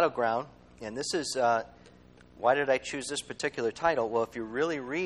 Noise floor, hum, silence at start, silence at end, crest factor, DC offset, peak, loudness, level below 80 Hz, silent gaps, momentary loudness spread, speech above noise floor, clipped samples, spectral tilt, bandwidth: -55 dBFS; none; 0 s; 0 s; 20 dB; under 0.1%; -12 dBFS; -30 LUFS; -64 dBFS; none; 9 LU; 26 dB; under 0.1%; -3.5 dB/octave; 12 kHz